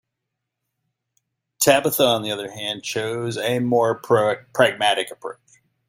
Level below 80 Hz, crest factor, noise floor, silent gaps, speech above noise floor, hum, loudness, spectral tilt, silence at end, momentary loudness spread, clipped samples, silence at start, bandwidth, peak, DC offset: -64 dBFS; 20 dB; -81 dBFS; none; 60 dB; none; -20 LUFS; -3.5 dB/octave; 0.55 s; 10 LU; under 0.1%; 1.6 s; 16.5 kHz; -2 dBFS; under 0.1%